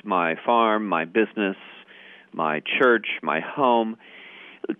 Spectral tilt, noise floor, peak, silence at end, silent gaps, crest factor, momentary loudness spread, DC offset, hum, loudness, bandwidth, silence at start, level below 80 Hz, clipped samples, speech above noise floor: -7.5 dB/octave; -48 dBFS; -6 dBFS; 0.05 s; none; 18 dB; 20 LU; under 0.1%; none; -22 LUFS; 3.9 kHz; 0.05 s; -74 dBFS; under 0.1%; 26 dB